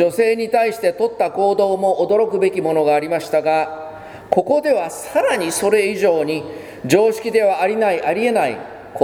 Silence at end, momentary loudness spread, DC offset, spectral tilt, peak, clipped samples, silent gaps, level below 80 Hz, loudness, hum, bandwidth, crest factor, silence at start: 0 s; 8 LU; under 0.1%; -4.5 dB/octave; 0 dBFS; under 0.1%; none; -60 dBFS; -17 LUFS; none; over 20 kHz; 18 dB; 0 s